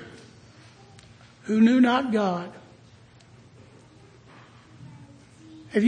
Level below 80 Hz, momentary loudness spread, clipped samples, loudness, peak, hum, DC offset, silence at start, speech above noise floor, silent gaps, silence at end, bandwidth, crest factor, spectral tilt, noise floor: -66 dBFS; 29 LU; under 0.1%; -22 LUFS; -8 dBFS; none; under 0.1%; 0 s; 31 dB; none; 0 s; 9.6 kHz; 18 dB; -6.5 dB/octave; -52 dBFS